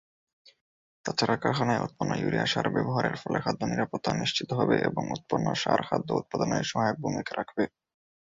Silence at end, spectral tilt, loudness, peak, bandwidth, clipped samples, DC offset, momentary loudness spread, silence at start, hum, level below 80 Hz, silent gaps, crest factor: 0.6 s; -5 dB/octave; -28 LUFS; -10 dBFS; 7.8 kHz; under 0.1%; under 0.1%; 6 LU; 1.05 s; none; -60 dBFS; none; 20 dB